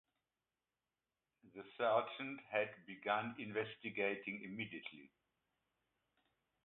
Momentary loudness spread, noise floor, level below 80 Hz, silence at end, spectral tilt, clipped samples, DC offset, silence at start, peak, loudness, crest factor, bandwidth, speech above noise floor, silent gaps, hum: 18 LU; under -90 dBFS; -86 dBFS; 1.6 s; -2.5 dB/octave; under 0.1%; under 0.1%; 1.45 s; -22 dBFS; -42 LUFS; 22 dB; 4 kHz; over 48 dB; none; none